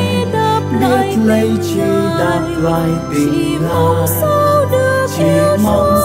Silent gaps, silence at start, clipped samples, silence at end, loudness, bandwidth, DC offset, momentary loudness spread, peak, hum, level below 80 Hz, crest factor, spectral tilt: none; 0 s; under 0.1%; 0 s; -13 LUFS; 16.5 kHz; under 0.1%; 4 LU; -2 dBFS; none; -36 dBFS; 12 dB; -6 dB/octave